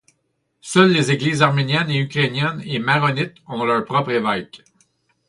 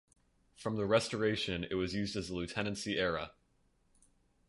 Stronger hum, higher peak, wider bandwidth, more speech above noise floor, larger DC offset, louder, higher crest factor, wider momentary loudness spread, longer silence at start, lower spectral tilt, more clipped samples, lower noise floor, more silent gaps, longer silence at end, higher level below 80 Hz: neither; first, 0 dBFS vs -16 dBFS; about the same, 11.5 kHz vs 11.5 kHz; first, 52 dB vs 38 dB; neither; first, -19 LUFS vs -35 LUFS; about the same, 20 dB vs 20 dB; about the same, 10 LU vs 9 LU; about the same, 0.65 s vs 0.6 s; about the same, -5.5 dB/octave vs -5 dB/octave; neither; about the same, -70 dBFS vs -73 dBFS; neither; second, 0.7 s vs 1.2 s; about the same, -60 dBFS vs -58 dBFS